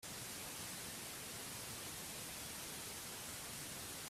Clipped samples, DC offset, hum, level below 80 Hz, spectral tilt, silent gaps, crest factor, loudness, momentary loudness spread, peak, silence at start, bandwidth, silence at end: under 0.1%; under 0.1%; none; -70 dBFS; -1.5 dB/octave; none; 14 dB; -46 LUFS; 1 LU; -36 dBFS; 0 s; 16 kHz; 0 s